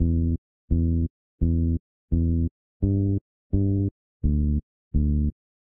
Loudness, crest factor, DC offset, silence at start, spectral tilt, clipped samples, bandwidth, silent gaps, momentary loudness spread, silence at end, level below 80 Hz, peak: -26 LUFS; 12 dB; under 0.1%; 0 s; -17 dB/octave; under 0.1%; 0.8 kHz; 0.38-0.68 s, 1.10-1.38 s, 1.80-2.08 s, 2.51-2.80 s, 3.21-3.50 s, 3.91-4.20 s, 4.63-4.91 s; 7 LU; 0.35 s; -30 dBFS; -12 dBFS